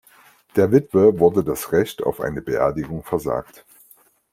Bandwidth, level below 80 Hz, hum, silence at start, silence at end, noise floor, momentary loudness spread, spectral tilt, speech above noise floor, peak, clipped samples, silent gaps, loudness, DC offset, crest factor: 16.5 kHz; -50 dBFS; none; 0.55 s; 0.9 s; -54 dBFS; 11 LU; -7 dB/octave; 35 dB; -2 dBFS; under 0.1%; none; -20 LUFS; under 0.1%; 18 dB